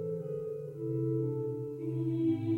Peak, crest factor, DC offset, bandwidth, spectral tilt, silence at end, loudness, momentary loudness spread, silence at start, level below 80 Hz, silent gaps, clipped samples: -20 dBFS; 12 dB; under 0.1%; 4.2 kHz; -11 dB/octave; 0 s; -35 LUFS; 7 LU; 0 s; -68 dBFS; none; under 0.1%